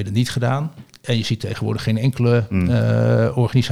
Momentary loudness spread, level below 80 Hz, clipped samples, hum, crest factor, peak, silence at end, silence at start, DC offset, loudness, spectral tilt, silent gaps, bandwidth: 7 LU; -46 dBFS; under 0.1%; none; 12 dB; -6 dBFS; 0 s; 0 s; 0.5%; -19 LUFS; -7 dB/octave; none; 13 kHz